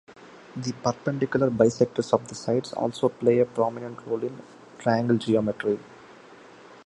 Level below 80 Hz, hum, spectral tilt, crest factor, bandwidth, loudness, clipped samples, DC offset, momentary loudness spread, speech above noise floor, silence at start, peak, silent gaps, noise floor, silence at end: -62 dBFS; none; -6.5 dB/octave; 22 dB; 11.5 kHz; -25 LUFS; under 0.1%; under 0.1%; 11 LU; 24 dB; 0.1 s; -4 dBFS; none; -49 dBFS; 0.1 s